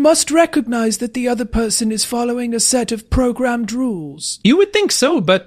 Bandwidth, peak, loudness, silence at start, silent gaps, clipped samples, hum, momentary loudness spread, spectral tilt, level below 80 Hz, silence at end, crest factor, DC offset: 15.5 kHz; -2 dBFS; -16 LUFS; 0 s; none; under 0.1%; none; 6 LU; -3.5 dB/octave; -34 dBFS; 0.05 s; 14 dB; under 0.1%